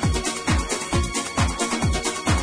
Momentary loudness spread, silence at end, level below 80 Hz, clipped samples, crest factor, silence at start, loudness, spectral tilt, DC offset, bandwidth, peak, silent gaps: 1 LU; 0 s; -30 dBFS; under 0.1%; 14 dB; 0 s; -23 LUFS; -4 dB/octave; under 0.1%; 10.5 kHz; -8 dBFS; none